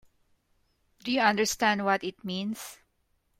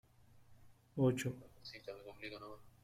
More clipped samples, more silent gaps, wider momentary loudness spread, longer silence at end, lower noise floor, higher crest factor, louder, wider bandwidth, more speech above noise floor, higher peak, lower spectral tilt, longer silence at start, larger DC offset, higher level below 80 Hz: neither; neither; about the same, 15 LU vs 17 LU; first, 0.65 s vs 0.15 s; first, -73 dBFS vs -64 dBFS; about the same, 22 dB vs 20 dB; first, -27 LUFS vs -41 LUFS; about the same, 16 kHz vs 16 kHz; first, 45 dB vs 23 dB; first, -8 dBFS vs -24 dBFS; second, -3.5 dB/octave vs -6.5 dB/octave; first, 1.05 s vs 0.35 s; neither; about the same, -66 dBFS vs -70 dBFS